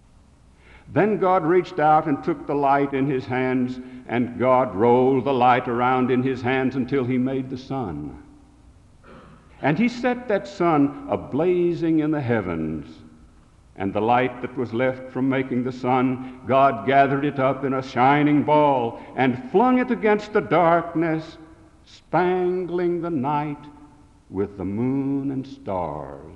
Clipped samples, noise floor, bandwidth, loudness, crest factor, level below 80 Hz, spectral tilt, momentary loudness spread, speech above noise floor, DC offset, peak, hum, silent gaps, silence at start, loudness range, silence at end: under 0.1%; -52 dBFS; 8 kHz; -22 LUFS; 18 dB; -54 dBFS; -8 dB/octave; 11 LU; 31 dB; under 0.1%; -4 dBFS; none; none; 0.75 s; 6 LU; 0 s